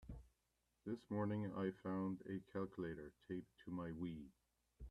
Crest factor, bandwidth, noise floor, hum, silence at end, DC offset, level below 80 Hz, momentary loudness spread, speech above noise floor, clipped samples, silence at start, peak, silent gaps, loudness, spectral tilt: 18 dB; 11 kHz; -86 dBFS; none; 0 s; under 0.1%; -68 dBFS; 13 LU; 39 dB; under 0.1%; 0 s; -30 dBFS; none; -48 LUFS; -9 dB/octave